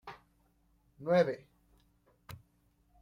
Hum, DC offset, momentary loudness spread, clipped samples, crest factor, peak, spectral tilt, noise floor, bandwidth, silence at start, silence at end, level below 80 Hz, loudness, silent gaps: none; under 0.1%; 24 LU; under 0.1%; 20 dB; -18 dBFS; -7 dB/octave; -71 dBFS; 16 kHz; 0.05 s; 0.65 s; -70 dBFS; -31 LUFS; none